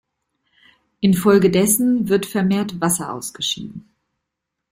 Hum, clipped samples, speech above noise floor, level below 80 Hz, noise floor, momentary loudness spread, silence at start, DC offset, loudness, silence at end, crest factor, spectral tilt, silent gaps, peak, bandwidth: none; under 0.1%; 62 dB; -56 dBFS; -80 dBFS; 10 LU; 1 s; under 0.1%; -18 LUFS; 0.95 s; 16 dB; -4.5 dB/octave; none; -4 dBFS; 16.5 kHz